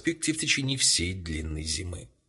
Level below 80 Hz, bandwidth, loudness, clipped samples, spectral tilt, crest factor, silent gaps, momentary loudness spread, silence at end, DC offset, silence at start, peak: -42 dBFS; 11.5 kHz; -26 LUFS; under 0.1%; -2.5 dB/octave; 20 dB; none; 12 LU; 0.2 s; under 0.1%; 0 s; -10 dBFS